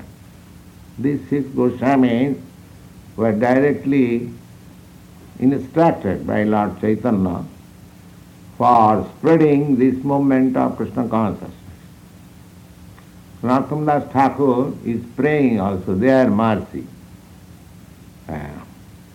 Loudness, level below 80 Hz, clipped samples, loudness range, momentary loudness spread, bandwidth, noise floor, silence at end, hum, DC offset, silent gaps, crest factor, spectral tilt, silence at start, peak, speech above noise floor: -18 LUFS; -50 dBFS; under 0.1%; 5 LU; 16 LU; 14.5 kHz; -42 dBFS; 0.2 s; none; under 0.1%; none; 18 dB; -8.5 dB/octave; 0 s; 0 dBFS; 25 dB